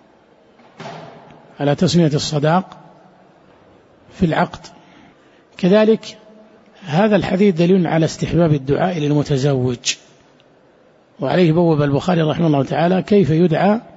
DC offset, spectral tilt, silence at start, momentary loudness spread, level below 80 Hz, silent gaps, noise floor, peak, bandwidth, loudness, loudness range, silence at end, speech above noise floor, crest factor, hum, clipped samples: under 0.1%; -6.5 dB/octave; 0.8 s; 13 LU; -46 dBFS; none; -51 dBFS; -2 dBFS; 8 kHz; -16 LUFS; 4 LU; 0.15 s; 36 dB; 14 dB; none; under 0.1%